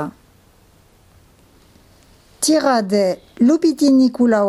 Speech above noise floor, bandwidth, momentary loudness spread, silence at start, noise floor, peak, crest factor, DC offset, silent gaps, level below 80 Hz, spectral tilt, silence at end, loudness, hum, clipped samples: 37 dB; 14 kHz; 8 LU; 0 s; -52 dBFS; -4 dBFS; 14 dB; under 0.1%; none; -56 dBFS; -4.5 dB/octave; 0 s; -16 LUFS; none; under 0.1%